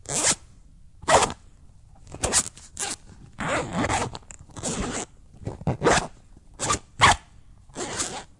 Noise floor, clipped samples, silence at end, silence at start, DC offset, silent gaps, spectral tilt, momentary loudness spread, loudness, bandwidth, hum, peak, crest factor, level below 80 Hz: -50 dBFS; under 0.1%; 0.15 s; 0.05 s; under 0.1%; none; -2.5 dB/octave; 20 LU; -25 LUFS; 11.5 kHz; none; -4 dBFS; 24 dB; -44 dBFS